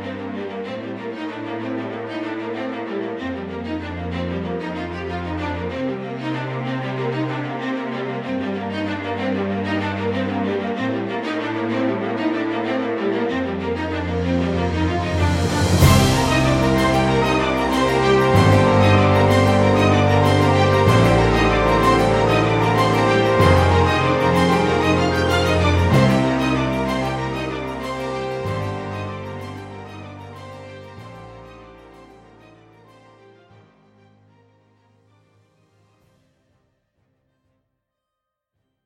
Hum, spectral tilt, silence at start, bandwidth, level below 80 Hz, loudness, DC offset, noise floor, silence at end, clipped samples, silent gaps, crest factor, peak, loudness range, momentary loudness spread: none; -6 dB/octave; 0 s; 16 kHz; -36 dBFS; -19 LUFS; under 0.1%; -81 dBFS; 6.8 s; under 0.1%; none; 18 dB; -2 dBFS; 12 LU; 14 LU